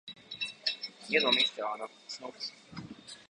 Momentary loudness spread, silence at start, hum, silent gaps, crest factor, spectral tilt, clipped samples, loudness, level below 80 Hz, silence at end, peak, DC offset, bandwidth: 20 LU; 0.05 s; none; none; 22 dB; -2.5 dB/octave; under 0.1%; -31 LUFS; -76 dBFS; 0.05 s; -12 dBFS; under 0.1%; 11 kHz